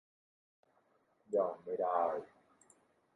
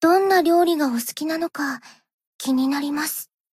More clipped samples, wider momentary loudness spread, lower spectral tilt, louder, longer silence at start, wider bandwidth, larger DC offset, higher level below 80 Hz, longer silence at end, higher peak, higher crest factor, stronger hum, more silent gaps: neither; second, 4 LU vs 12 LU; first, -6.5 dB/octave vs -2.5 dB/octave; second, -37 LUFS vs -21 LUFS; first, 1.3 s vs 0 s; second, 11 kHz vs 16 kHz; neither; second, -86 dBFS vs -70 dBFS; first, 0.9 s vs 0.3 s; second, -22 dBFS vs -6 dBFS; first, 20 dB vs 14 dB; neither; second, none vs 2.14-2.19 s, 2.27-2.39 s